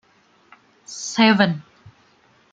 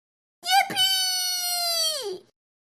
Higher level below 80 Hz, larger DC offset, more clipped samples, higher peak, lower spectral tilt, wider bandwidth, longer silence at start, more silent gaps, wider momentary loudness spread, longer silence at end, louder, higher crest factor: first, -64 dBFS vs -74 dBFS; neither; neither; first, -2 dBFS vs -8 dBFS; first, -4.5 dB/octave vs 1 dB/octave; second, 8.8 kHz vs 13.5 kHz; first, 0.9 s vs 0.45 s; neither; about the same, 17 LU vs 15 LU; first, 0.9 s vs 0.45 s; first, -19 LUFS vs -22 LUFS; about the same, 22 dB vs 18 dB